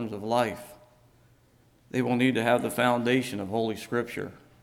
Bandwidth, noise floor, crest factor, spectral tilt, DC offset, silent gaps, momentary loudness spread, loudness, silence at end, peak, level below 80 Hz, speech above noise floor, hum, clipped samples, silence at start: 16.5 kHz; -62 dBFS; 18 dB; -5.5 dB/octave; under 0.1%; none; 13 LU; -27 LUFS; 0.25 s; -10 dBFS; -66 dBFS; 35 dB; none; under 0.1%; 0 s